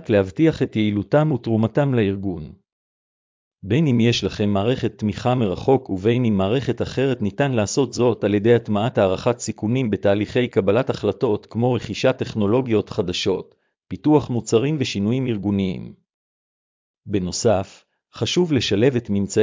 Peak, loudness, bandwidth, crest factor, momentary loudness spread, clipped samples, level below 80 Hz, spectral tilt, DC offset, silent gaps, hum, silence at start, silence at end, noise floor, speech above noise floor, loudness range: -4 dBFS; -20 LUFS; 7.6 kHz; 16 dB; 6 LU; under 0.1%; -46 dBFS; -6 dB/octave; under 0.1%; 2.72-3.51 s, 16.14-16.94 s; none; 0 s; 0 s; under -90 dBFS; over 70 dB; 3 LU